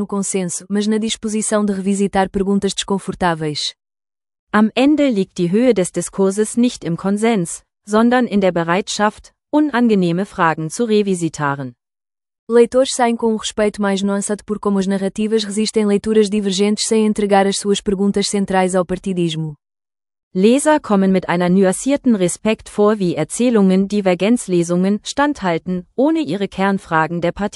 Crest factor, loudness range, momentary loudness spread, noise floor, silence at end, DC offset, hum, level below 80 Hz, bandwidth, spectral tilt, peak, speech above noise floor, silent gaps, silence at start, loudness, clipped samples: 16 dB; 2 LU; 6 LU; under -90 dBFS; 0.05 s; under 0.1%; none; -48 dBFS; 12 kHz; -5 dB/octave; 0 dBFS; over 74 dB; 4.39-4.47 s, 12.39-12.47 s, 20.23-20.31 s; 0 s; -17 LUFS; under 0.1%